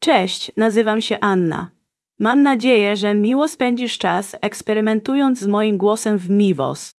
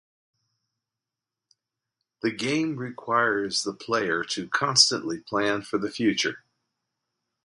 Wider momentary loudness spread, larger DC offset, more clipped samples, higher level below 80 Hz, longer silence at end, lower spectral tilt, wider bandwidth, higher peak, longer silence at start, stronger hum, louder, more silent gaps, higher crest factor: second, 7 LU vs 12 LU; neither; neither; about the same, -66 dBFS vs -68 dBFS; second, 0.1 s vs 1.05 s; first, -5 dB/octave vs -2.5 dB/octave; about the same, 12 kHz vs 11.5 kHz; about the same, -2 dBFS vs -2 dBFS; second, 0 s vs 2.25 s; neither; first, -18 LUFS vs -25 LUFS; neither; second, 16 dB vs 26 dB